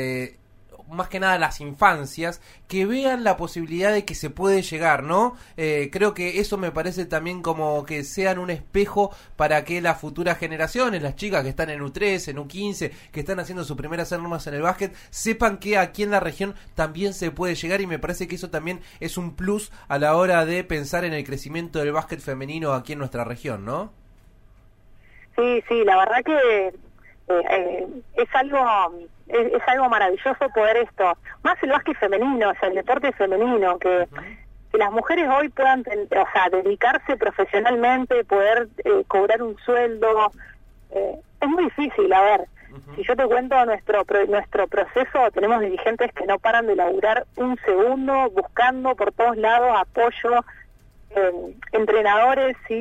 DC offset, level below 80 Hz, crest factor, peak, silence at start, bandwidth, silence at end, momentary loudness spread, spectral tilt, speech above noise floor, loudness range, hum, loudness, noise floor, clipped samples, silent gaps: under 0.1%; -46 dBFS; 20 dB; -2 dBFS; 0 s; 16 kHz; 0 s; 11 LU; -5 dB/octave; 30 dB; 7 LU; none; -22 LUFS; -51 dBFS; under 0.1%; none